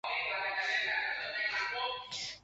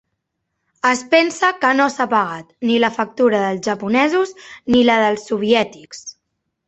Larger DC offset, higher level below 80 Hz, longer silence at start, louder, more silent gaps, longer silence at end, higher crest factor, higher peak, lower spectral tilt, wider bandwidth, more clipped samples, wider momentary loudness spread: neither; second, -70 dBFS vs -56 dBFS; second, 0.05 s vs 0.85 s; second, -34 LUFS vs -17 LUFS; neither; second, 0.05 s vs 0.55 s; about the same, 16 dB vs 16 dB; second, -20 dBFS vs -2 dBFS; second, 0 dB/octave vs -4 dB/octave; about the same, 8.2 kHz vs 8.2 kHz; neither; second, 6 LU vs 11 LU